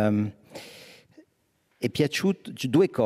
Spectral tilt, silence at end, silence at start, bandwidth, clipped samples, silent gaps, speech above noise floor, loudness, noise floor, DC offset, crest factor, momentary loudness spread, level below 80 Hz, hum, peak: -6 dB/octave; 0 s; 0 s; 16 kHz; under 0.1%; none; 46 dB; -26 LUFS; -70 dBFS; under 0.1%; 18 dB; 21 LU; -66 dBFS; none; -10 dBFS